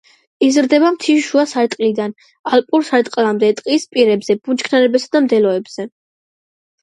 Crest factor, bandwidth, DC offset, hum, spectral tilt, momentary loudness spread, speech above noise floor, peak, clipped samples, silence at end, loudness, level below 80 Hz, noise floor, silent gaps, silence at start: 16 dB; 11.5 kHz; under 0.1%; none; -4.5 dB/octave; 9 LU; over 75 dB; 0 dBFS; under 0.1%; 0.95 s; -15 LUFS; -68 dBFS; under -90 dBFS; 2.39-2.44 s; 0.4 s